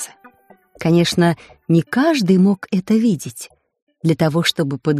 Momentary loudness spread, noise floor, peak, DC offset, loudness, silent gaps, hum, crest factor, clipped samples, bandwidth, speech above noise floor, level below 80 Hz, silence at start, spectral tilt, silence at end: 14 LU; -50 dBFS; -2 dBFS; under 0.1%; -17 LUFS; 3.82-3.87 s; none; 14 dB; under 0.1%; 15 kHz; 34 dB; -56 dBFS; 0 s; -6 dB/octave; 0 s